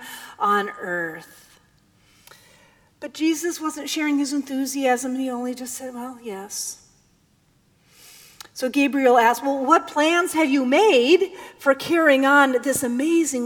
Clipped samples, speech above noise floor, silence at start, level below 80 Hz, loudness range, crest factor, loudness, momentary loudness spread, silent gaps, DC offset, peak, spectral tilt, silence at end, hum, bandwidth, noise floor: under 0.1%; 41 dB; 0 s; -68 dBFS; 11 LU; 20 dB; -20 LUFS; 15 LU; none; under 0.1%; -2 dBFS; -2.5 dB/octave; 0 s; none; 20 kHz; -61 dBFS